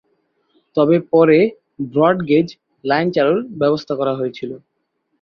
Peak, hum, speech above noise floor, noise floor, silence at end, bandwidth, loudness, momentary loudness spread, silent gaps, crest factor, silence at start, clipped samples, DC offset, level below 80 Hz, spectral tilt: -2 dBFS; none; 54 dB; -70 dBFS; 0.65 s; 6.4 kHz; -17 LUFS; 15 LU; none; 16 dB; 0.75 s; under 0.1%; under 0.1%; -60 dBFS; -8 dB/octave